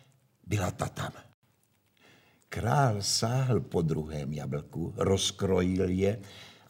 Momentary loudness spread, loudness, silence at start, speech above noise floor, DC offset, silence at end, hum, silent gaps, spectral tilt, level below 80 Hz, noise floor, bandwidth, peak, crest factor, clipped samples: 11 LU; -30 LUFS; 0.45 s; 41 dB; under 0.1%; 0.15 s; none; 1.34-1.42 s; -5 dB/octave; -58 dBFS; -70 dBFS; 16 kHz; -12 dBFS; 20 dB; under 0.1%